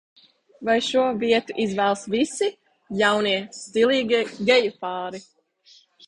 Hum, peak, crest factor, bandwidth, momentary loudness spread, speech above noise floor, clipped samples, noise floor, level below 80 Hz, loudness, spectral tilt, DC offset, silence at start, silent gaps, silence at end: none; -4 dBFS; 18 dB; 11 kHz; 11 LU; 34 dB; under 0.1%; -56 dBFS; -64 dBFS; -22 LUFS; -4 dB/octave; under 0.1%; 0.6 s; none; 0.85 s